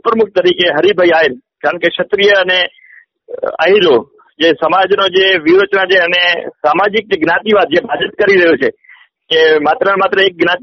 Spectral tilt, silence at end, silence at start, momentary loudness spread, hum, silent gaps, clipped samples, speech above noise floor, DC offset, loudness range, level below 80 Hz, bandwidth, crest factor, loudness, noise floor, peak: -1 dB/octave; 0.05 s; 0.05 s; 6 LU; none; none; under 0.1%; 32 dB; under 0.1%; 2 LU; -56 dBFS; 6.4 kHz; 12 dB; -11 LUFS; -43 dBFS; 0 dBFS